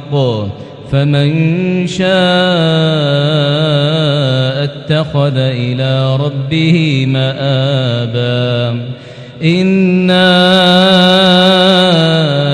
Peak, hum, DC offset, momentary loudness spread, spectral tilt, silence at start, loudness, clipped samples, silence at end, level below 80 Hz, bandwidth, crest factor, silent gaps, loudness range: 0 dBFS; none; under 0.1%; 9 LU; -6.5 dB/octave; 0 s; -11 LUFS; 0.5%; 0 s; -46 dBFS; 10.5 kHz; 10 dB; none; 5 LU